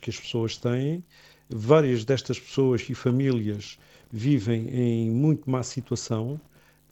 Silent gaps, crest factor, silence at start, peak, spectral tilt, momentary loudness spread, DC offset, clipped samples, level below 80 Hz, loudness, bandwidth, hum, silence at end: none; 22 dB; 0 s; -4 dBFS; -7 dB/octave; 13 LU; under 0.1%; under 0.1%; -60 dBFS; -26 LUFS; 8.4 kHz; none; 0.5 s